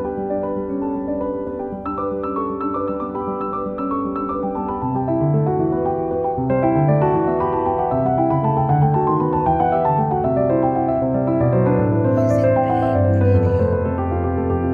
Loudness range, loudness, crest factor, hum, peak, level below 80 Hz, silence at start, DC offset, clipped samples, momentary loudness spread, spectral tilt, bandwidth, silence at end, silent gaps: 6 LU; -19 LUFS; 14 dB; none; -4 dBFS; -40 dBFS; 0 s; under 0.1%; under 0.1%; 7 LU; -11 dB/octave; 7 kHz; 0 s; none